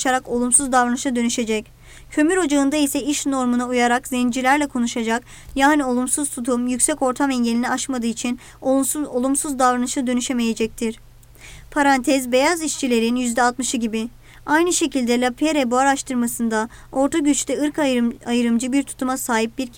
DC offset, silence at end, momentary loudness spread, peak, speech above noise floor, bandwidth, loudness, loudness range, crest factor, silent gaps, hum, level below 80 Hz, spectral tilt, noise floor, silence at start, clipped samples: under 0.1%; 0 s; 7 LU; -6 dBFS; 23 dB; 19 kHz; -20 LUFS; 2 LU; 14 dB; none; none; -48 dBFS; -2.5 dB/octave; -43 dBFS; 0 s; under 0.1%